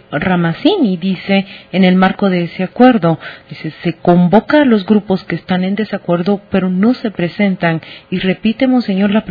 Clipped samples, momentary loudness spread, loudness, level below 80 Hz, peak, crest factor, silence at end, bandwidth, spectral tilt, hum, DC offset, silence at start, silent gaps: 0.2%; 10 LU; -13 LUFS; -48 dBFS; 0 dBFS; 12 dB; 0 s; 5 kHz; -9.5 dB/octave; none; under 0.1%; 0.1 s; none